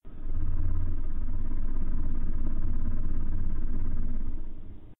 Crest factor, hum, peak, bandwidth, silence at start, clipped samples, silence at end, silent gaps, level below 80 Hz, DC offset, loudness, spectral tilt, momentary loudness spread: 8 dB; none; -14 dBFS; 1.7 kHz; 0.05 s; under 0.1%; 0.05 s; none; -26 dBFS; under 0.1%; -36 LUFS; -11.5 dB/octave; 6 LU